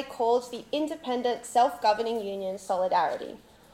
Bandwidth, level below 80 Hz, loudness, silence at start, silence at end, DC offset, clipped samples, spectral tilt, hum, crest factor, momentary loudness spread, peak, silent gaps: 16.5 kHz; -66 dBFS; -28 LUFS; 0 s; 0.35 s; under 0.1%; under 0.1%; -3.5 dB/octave; none; 18 dB; 9 LU; -10 dBFS; none